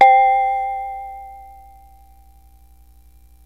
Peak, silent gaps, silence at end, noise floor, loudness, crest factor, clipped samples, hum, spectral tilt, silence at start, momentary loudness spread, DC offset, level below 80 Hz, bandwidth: 0 dBFS; none; 2 s; -49 dBFS; -17 LUFS; 18 dB; under 0.1%; 60 Hz at -50 dBFS; -3.5 dB/octave; 0 s; 25 LU; 0.2%; -48 dBFS; 5 kHz